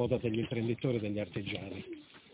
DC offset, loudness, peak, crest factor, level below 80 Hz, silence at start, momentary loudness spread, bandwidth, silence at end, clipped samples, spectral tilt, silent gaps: under 0.1%; -35 LUFS; -18 dBFS; 18 dB; -58 dBFS; 0 s; 12 LU; 4 kHz; 0.15 s; under 0.1%; -6 dB/octave; none